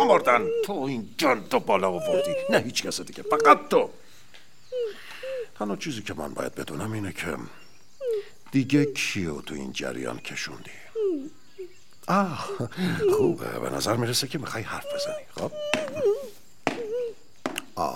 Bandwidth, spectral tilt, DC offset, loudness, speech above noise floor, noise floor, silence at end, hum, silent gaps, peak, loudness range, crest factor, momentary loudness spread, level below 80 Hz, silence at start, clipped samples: 16.5 kHz; -4.5 dB/octave; 0.7%; -27 LUFS; 28 dB; -54 dBFS; 0 s; none; none; -2 dBFS; 9 LU; 24 dB; 13 LU; -60 dBFS; 0 s; under 0.1%